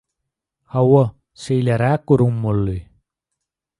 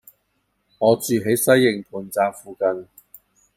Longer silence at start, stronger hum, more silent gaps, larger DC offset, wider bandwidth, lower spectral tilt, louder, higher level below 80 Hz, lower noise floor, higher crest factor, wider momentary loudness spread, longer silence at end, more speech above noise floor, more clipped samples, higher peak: about the same, 0.75 s vs 0.8 s; neither; neither; neither; second, 11 kHz vs 16 kHz; first, -8.5 dB/octave vs -4.5 dB/octave; about the same, -18 LUFS vs -20 LUFS; first, -44 dBFS vs -64 dBFS; first, -80 dBFS vs -70 dBFS; about the same, 18 dB vs 18 dB; about the same, 11 LU vs 11 LU; first, 1 s vs 0.75 s; first, 64 dB vs 50 dB; neither; about the same, -2 dBFS vs -2 dBFS